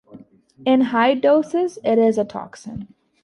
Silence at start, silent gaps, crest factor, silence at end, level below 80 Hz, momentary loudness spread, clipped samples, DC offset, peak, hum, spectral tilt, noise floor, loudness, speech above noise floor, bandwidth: 0.15 s; none; 14 dB; 0.4 s; -60 dBFS; 18 LU; under 0.1%; under 0.1%; -6 dBFS; none; -6 dB/octave; -46 dBFS; -18 LUFS; 27 dB; 11 kHz